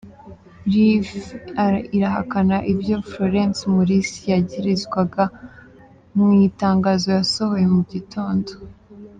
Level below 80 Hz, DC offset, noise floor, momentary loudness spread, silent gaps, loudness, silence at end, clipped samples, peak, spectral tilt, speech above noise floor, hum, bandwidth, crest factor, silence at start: -50 dBFS; under 0.1%; -47 dBFS; 10 LU; none; -20 LUFS; 0.1 s; under 0.1%; -6 dBFS; -6.5 dB/octave; 28 dB; none; 9.2 kHz; 14 dB; 0.05 s